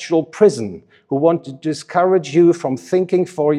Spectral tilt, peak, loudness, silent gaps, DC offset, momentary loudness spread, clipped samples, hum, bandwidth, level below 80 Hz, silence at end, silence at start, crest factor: -6.5 dB/octave; 0 dBFS; -17 LUFS; none; under 0.1%; 11 LU; under 0.1%; none; 11 kHz; -68 dBFS; 0 s; 0 s; 16 dB